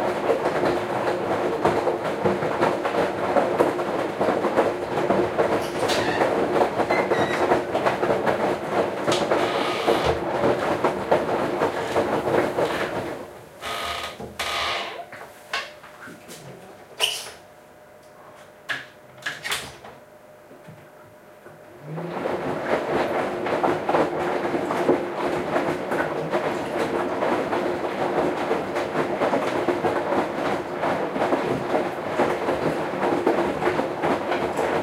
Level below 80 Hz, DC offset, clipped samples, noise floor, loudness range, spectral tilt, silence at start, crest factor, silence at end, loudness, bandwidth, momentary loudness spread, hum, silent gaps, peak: -54 dBFS; under 0.1%; under 0.1%; -48 dBFS; 9 LU; -5 dB/octave; 0 s; 20 dB; 0 s; -24 LUFS; 16 kHz; 10 LU; none; none; -4 dBFS